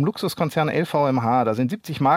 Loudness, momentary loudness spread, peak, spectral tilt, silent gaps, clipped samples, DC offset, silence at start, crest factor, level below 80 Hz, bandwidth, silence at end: -22 LUFS; 5 LU; -6 dBFS; -6.5 dB/octave; none; under 0.1%; under 0.1%; 0 s; 16 dB; -62 dBFS; 16.5 kHz; 0 s